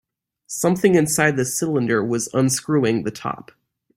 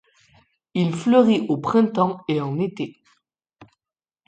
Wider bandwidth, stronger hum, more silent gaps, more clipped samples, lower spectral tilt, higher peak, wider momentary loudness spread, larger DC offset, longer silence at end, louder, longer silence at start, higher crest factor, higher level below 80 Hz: first, 16 kHz vs 9 kHz; neither; neither; neither; second, -5 dB/octave vs -7.5 dB/octave; about the same, -2 dBFS vs -4 dBFS; about the same, 13 LU vs 12 LU; neither; about the same, 0.6 s vs 0.65 s; about the same, -20 LUFS vs -21 LUFS; second, 0.5 s vs 0.75 s; about the same, 18 dB vs 18 dB; first, -58 dBFS vs -66 dBFS